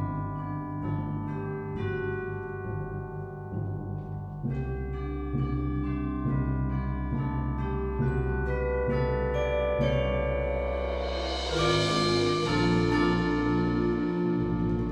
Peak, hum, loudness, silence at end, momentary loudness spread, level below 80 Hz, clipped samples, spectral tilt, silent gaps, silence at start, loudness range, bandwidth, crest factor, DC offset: -12 dBFS; none; -29 LUFS; 0 s; 10 LU; -36 dBFS; under 0.1%; -6.5 dB/octave; none; 0 s; 8 LU; 10.5 kHz; 16 dB; under 0.1%